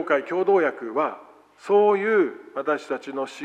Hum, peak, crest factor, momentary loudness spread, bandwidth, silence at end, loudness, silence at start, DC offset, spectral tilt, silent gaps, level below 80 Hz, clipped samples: 50 Hz at -75 dBFS; -6 dBFS; 16 dB; 11 LU; 9 kHz; 0 s; -23 LUFS; 0 s; under 0.1%; -6 dB/octave; none; -82 dBFS; under 0.1%